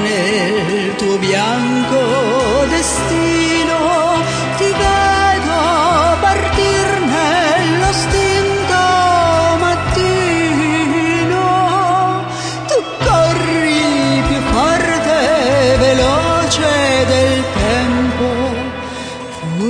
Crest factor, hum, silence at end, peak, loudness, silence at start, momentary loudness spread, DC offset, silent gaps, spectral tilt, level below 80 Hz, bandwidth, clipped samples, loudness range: 12 dB; none; 0 s; -2 dBFS; -13 LUFS; 0 s; 5 LU; under 0.1%; none; -4.5 dB/octave; -30 dBFS; 10.5 kHz; under 0.1%; 2 LU